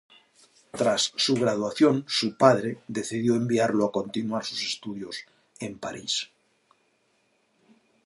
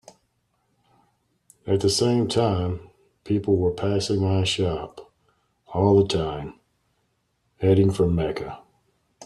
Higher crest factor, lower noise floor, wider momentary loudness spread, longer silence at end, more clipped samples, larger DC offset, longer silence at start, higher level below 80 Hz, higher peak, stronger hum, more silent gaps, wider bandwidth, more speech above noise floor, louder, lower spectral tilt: first, 24 dB vs 18 dB; about the same, -69 dBFS vs -71 dBFS; about the same, 16 LU vs 16 LU; first, 1.8 s vs 0 s; neither; neither; second, 0.75 s vs 1.65 s; second, -70 dBFS vs -50 dBFS; about the same, -4 dBFS vs -6 dBFS; neither; neither; about the same, 11.5 kHz vs 12 kHz; second, 43 dB vs 49 dB; about the same, -25 LUFS vs -23 LUFS; second, -4.5 dB/octave vs -6 dB/octave